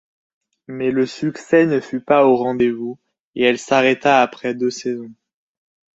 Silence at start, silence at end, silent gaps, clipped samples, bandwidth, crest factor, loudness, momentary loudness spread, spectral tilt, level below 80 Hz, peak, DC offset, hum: 0.7 s; 0.85 s; 3.20-3.33 s; under 0.1%; 8 kHz; 18 dB; -18 LUFS; 13 LU; -5.5 dB/octave; -62 dBFS; 0 dBFS; under 0.1%; none